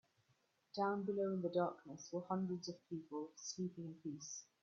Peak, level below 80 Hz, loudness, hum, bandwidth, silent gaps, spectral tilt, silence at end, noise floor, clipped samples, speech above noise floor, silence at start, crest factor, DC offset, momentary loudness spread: -26 dBFS; -86 dBFS; -44 LUFS; none; 7.4 kHz; none; -6.5 dB/octave; 0.2 s; -80 dBFS; under 0.1%; 36 dB; 0.75 s; 18 dB; under 0.1%; 11 LU